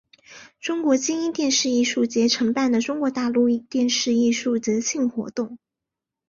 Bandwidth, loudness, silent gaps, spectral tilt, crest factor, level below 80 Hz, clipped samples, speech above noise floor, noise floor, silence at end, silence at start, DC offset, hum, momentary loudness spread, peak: 7.6 kHz; -22 LUFS; none; -3 dB/octave; 14 dB; -66 dBFS; under 0.1%; 64 dB; -86 dBFS; 0.75 s; 0.3 s; under 0.1%; none; 8 LU; -8 dBFS